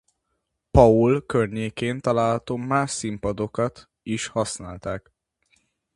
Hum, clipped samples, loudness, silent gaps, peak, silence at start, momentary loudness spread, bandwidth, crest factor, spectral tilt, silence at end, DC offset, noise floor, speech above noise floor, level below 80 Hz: none; under 0.1%; -23 LUFS; none; 0 dBFS; 0.75 s; 16 LU; 11.5 kHz; 24 dB; -6 dB/octave; 0.95 s; under 0.1%; -77 dBFS; 55 dB; -40 dBFS